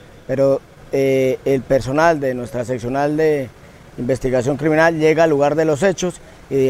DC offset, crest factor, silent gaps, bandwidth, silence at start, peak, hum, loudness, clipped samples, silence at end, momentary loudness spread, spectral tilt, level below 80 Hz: under 0.1%; 16 dB; none; 15.5 kHz; 0.3 s; 0 dBFS; none; -17 LUFS; under 0.1%; 0 s; 10 LU; -6 dB/octave; -44 dBFS